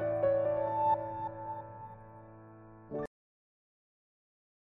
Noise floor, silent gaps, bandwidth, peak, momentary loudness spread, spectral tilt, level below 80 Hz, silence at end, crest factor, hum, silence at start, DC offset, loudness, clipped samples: -53 dBFS; none; 3.8 kHz; -20 dBFS; 24 LU; -9.5 dB/octave; -66 dBFS; 1.7 s; 18 dB; none; 0 s; under 0.1%; -34 LUFS; under 0.1%